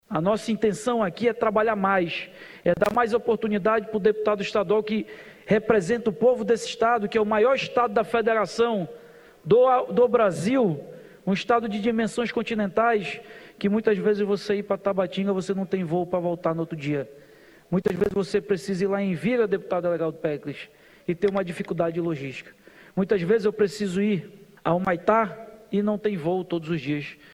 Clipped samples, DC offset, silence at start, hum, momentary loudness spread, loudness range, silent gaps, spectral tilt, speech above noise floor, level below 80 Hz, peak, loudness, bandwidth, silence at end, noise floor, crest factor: under 0.1%; under 0.1%; 0.1 s; none; 9 LU; 4 LU; none; -6.5 dB/octave; 28 dB; -58 dBFS; -4 dBFS; -24 LUFS; 13 kHz; 0.2 s; -51 dBFS; 20 dB